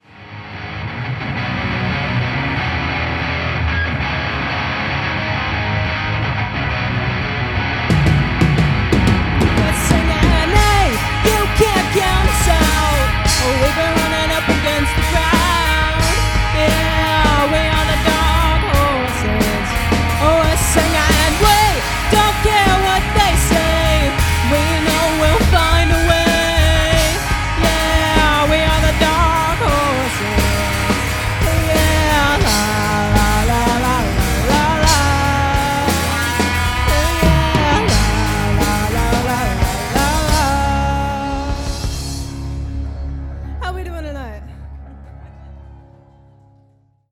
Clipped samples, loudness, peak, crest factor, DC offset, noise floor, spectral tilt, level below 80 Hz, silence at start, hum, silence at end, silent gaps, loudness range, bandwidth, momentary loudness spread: under 0.1%; -15 LUFS; 0 dBFS; 16 dB; under 0.1%; -55 dBFS; -4.5 dB/octave; -22 dBFS; 0.15 s; none; 1.3 s; none; 6 LU; 18 kHz; 9 LU